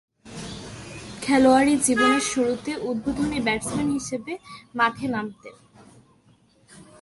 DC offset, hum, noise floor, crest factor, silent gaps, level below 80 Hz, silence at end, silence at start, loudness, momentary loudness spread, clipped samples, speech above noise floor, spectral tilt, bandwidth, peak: under 0.1%; none; -59 dBFS; 20 dB; none; -52 dBFS; 0.2 s; 0.25 s; -22 LUFS; 20 LU; under 0.1%; 36 dB; -3.5 dB/octave; 11.5 kHz; -6 dBFS